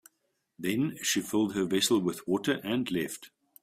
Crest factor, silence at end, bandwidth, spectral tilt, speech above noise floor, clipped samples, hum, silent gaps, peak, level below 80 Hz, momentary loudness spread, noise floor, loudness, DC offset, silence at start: 18 dB; 0.35 s; 16 kHz; -4 dB/octave; 49 dB; under 0.1%; none; none; -14 dBFS; -68 dBFS; 8 LU; -78 dBFS; -29 LUFS; under 0.1%; 0.6 s